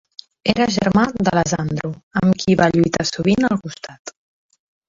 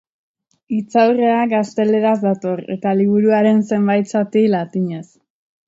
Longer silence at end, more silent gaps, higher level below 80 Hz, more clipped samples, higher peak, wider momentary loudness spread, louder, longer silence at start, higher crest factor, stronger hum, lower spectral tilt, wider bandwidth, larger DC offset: first, 0.8 s vs 0.65 s; first, 2.03-2.11 s, 3.99-4.05 s vs none; first, -46 dBFS vs -66 dBFS; neither; about the same, -2 dBFS vs -2 dBFS; first, 17 LU vs 9 LU; about the same, -18 LUFS vs -16 LUFS; second, 0.45 s vs 0.7 s; about the same, 18 dB vs 16 dB; neither; second, -5.5 dB/octave vs -7.5 dB/octave; about the same, 7.6 kHz vs 7.8 kHz; neither